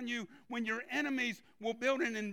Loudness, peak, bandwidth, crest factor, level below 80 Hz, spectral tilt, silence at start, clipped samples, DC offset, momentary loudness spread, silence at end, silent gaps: -36 LUFS; -22 dBFS; 16.5 kHz; 16 dB; -82 dBFS; -3.5 dB/octave; 0 s; under 0.1%; under 0.1%; 8 LU; 0 s; none